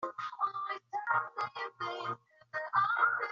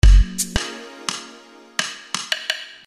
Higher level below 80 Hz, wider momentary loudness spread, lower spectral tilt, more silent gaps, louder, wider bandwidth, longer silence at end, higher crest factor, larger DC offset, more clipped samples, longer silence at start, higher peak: second, -82 dBFS vs -20 dBFS; about the same, 12 LU vs 13 LU; second, -0.5 dB/octave vs -3 dB/octave; neither; second, -34 LUFS vs -23 LUFS; second, 7.4 kHz vs 14.5 kHz; second, 0 s vs 0.2 s; about the same, 18 dB vs 18 dB; neither; neither; about the same, 0 s vs 0.05 s; second, -16 dBFS vs 0 dBFS